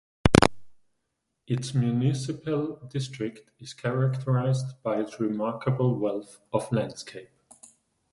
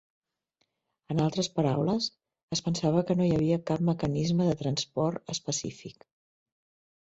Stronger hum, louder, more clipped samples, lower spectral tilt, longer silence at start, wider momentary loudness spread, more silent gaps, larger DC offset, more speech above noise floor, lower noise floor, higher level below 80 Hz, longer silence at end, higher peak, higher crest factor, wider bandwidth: neither; about the same, -27 LUFS vs -29 LUFS; neither; about the same, -6.5 dB/octave vs -6 dB/octave; second, 0.25 s vs 1.1 s; first, 14 LU vs 8 LU; second, none vs 2.43-2.48 s; neither; about the same, 51 dB vs 50 dB; about the same, -79 dBFS vs -78 dBFS; first, -46 dBFS vs -60 dBFS; second, 0.85 s vs 1.1 s; first, 0 dBFS vs -12 dBFS; first, 28 dB vs 18 dB; first, 11.5 kHz vs 8 kHz